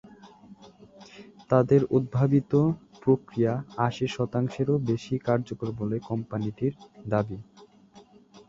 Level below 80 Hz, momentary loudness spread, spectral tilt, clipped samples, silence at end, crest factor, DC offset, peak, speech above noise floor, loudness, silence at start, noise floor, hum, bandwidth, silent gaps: -58 dBFS; 10 LU; -8.5 dB/octave; under 0.1%; 0.1 s; 22 dB; under 0.1%; -6 dBFS; 29 dB; -27 LUFS; 0.25 s; -54 dBFS; none; 7.6 kHz; none